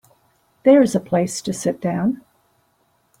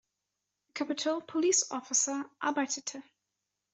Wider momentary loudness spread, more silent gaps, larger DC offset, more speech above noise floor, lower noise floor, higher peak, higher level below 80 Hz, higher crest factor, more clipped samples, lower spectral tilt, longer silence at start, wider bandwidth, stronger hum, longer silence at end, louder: second, 10 LU vs 13 LU; neither; neither; second, 46 dB vs 54 dB; second, -64 dBFS vs -86 dBFS; first, -4 dBFS vs -12 dBFS; first, -60 dBFS vs -84 dBFS; about the same, 18 dB vs 20 dB; neither; first, -6 dB/octave vs -0.5 dB/octave; about the same, 0.65 s vs 0.75 s; first, 15.5 kHz vs 8.2 kHz; second, none vs 50 Hz at -85 dBFS; first, 1.05 s vs 0.7 s; first, -19 LUFS vs -31 LUFS